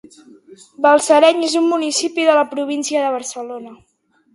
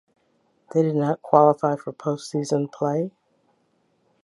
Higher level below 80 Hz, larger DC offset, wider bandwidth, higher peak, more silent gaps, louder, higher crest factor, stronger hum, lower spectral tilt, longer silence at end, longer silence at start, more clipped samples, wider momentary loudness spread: first, -70 dBFS vs -76 dBFS; neither; about the same, 11.5 kHz vs 11.5 kHz; about the same, 0 dBFS vs -2 dBFS; neither; first, -16 LUFS vs -23 LUFS; second, 16 dB vs 22 dB; neither; second, -1.5 dB/octave vs -7.5 dB/octave; second, 0.6 s vs 1.15 s; second, 0.5 s vs 0.75 s; neither; first, 15 LU vs 11 LU